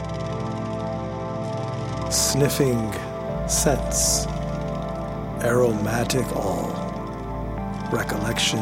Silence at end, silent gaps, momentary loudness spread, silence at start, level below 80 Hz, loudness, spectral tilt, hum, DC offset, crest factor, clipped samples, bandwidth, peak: 0 s; none; 10 LU; 0 s; -36 dBFS; -24 LUFS; -4 dB/octave; none; under 0.1%; 18 dB; under 0.1%; 17 kHz; -6 dBFS